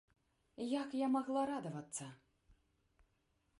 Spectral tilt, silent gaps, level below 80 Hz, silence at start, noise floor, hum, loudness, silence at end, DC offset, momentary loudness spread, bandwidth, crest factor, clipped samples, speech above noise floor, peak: -5 dB/octave; none; -78 dBFS; 0.6 s; -80 dBFS; none; -40 LUFS; 1.45 s; under 0.1%; 11 LU; 11.5 kHz; 16 dB; under 0.1%; 40 dB; -26 dBFS